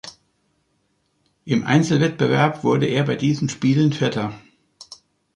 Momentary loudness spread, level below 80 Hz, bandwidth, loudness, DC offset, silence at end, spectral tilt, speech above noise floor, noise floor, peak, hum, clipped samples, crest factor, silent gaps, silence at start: 18 LU; -58 dBFS; 10.5 kHz; -20 LUFS; under 0.1%; 0.4 s; -6.5 dB/octave; 49 dB; -68 dBFS; -4 dBFS; none; under 0.1%; 18 dB; none; 0.05 s